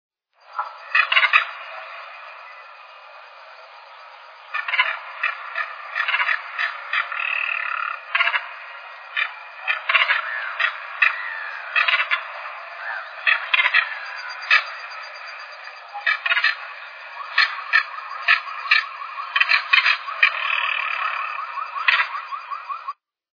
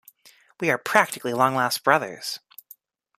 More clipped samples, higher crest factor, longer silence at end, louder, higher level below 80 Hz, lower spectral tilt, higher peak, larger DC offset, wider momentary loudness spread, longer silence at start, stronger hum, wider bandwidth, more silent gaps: neither; about the same, 24 dB vs 24 dB; second, 0.4 s vs 0.8 s; first, -20 LUFS vs -23 LUFS; second, under -90 dBFS vs -72 dBFS; second, 4.5 dB/octave vs -3.5 dB/octave; about the same, 0 dBFS vs -2 dBFS; neither; first, 19 LU vs 12 LU; about the same, 0.5 s vs 0.6 s; neither; second, 5.4 kHz vs 15.5 kHz; neither